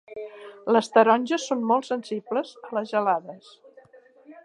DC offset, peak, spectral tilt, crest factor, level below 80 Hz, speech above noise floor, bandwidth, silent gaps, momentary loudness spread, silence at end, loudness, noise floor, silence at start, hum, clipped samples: under 0.1%; -4 dBFS; -4.5 dB/octave; 22 dB; -80 dBFS; 30 dB; 11 kHz; none; 19 LU; 0.1 s; -24 LUFS; -53 dBFS; 0.1 s; none; under 0.1%